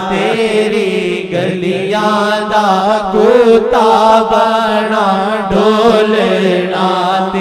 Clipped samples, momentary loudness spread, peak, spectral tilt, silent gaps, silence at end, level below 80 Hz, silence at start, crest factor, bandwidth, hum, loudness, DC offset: under 0.1%; 6 LU; 0 dBFS; -5.5 dB/octave; none; 0 s; -42 dBFS; 0 s; 10 dB; 14 kHz; none; -11 LUFS; under 0.1%